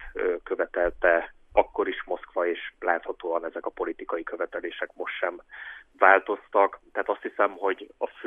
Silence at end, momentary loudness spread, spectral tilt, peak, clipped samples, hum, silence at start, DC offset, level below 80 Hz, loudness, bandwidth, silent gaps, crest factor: 0 s; 11 LU; -6 dB/octave; -2 dBFS; under 0.1%; none; 0 s; under 0.1%; -54 dBFS; -27 LUFS; 3.8 kHz; none; 24 dB